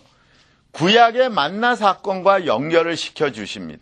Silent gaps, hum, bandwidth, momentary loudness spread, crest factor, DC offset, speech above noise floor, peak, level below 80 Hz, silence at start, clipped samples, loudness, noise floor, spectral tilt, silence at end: none; none; 10 kHz; 10 LU; 18 dB; under 0.1%; 38 dB; 0 dBFS; -62 dBFS; 0.75 s; under 0.1%; -17 LUFS; -56 dBFS; -4.5 dB/octave; 0.05 s